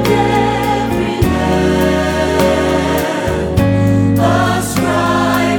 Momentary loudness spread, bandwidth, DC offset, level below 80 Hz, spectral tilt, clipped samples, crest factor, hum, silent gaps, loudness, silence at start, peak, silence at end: 3 LU; 20 kHz; under 0.1%; -28 dBFS; -6 dB/octave; under 0.1%; 12 dB; none; none; -13 LUFS; 0 s; 0 dBFS; 0 s